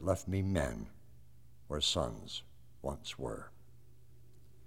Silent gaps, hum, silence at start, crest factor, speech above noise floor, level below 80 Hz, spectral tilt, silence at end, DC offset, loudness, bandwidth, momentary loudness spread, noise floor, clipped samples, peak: none; none; 0 s; 24 dB; 25 dB; -52 dBFS; -4.5 dB/octave; 0.45 s; 0.2%; -37 LUFS; 16 kHz; 15 LU; -62 dBFS; under 0.1%; -16 dBFS